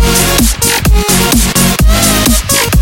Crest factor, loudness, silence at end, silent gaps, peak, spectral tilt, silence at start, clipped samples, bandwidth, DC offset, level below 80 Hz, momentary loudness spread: 8 dB; -8 LUFS; 0 s; none; 0 dBFS; -3.5 dB/octave; 0 s; 0.3%; 17.5 kHz; 0.7%; -14 dBFS; 1 LU